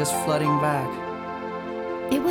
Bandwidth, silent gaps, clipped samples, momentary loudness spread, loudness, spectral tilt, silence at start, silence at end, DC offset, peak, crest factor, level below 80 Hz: 19.5 kHz; none; under 0.1%; 10 LU; -26 LUFS; -5 dB/octave; 0 s; 0 s; under 0.1%; -10 dBFS; 16 dB; -58 dBFS